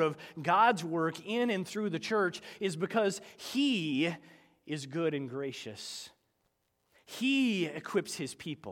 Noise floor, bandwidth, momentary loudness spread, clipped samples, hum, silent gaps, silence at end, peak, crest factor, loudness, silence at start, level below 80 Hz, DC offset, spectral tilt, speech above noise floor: -78 dBFS; 17 kHz; 14 LU; under 0.1%; none; none; 0 s; -12 dBFS; 20 dB; -32 LUFS; 0 s; -80 dBFS; under 0.1%; -4.5 dB/octave; 46 dB